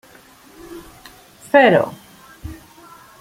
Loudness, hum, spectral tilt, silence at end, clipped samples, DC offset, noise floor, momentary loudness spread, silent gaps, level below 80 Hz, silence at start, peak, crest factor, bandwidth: -15 LUFS; none; -5.5 dB/octave; 0.65 s; under 0.1%; under 0.1%; -47 dBFS; 26 LU; none; -50 dBFS; 0.7 s; -2 dBFS; 20 dB; 16.5 kHz